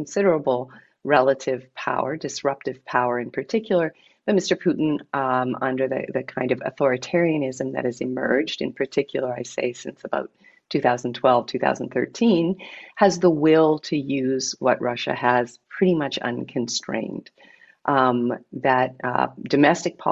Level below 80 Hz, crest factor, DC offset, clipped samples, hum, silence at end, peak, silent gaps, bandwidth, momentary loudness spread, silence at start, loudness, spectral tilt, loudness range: -66 dBFS; 18 dB; under 0.1%; under 0.1%; none; 0 s; -4 dBFS; none; 8.2 kHz; 10 LU; 0 s; -23 LUFS; -5 dB/octave; 4 LU